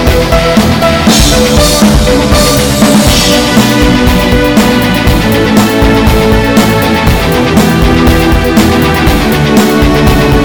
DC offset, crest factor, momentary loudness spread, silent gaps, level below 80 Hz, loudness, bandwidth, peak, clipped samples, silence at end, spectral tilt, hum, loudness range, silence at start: under 0.1%; 6 dB; 2 LU; none; -14 dBFS; -7 LUFS; 19 kHz; 0 dBFS; 0.7%; 0 s; -5 dB/octave; none; 1 LU; 0 s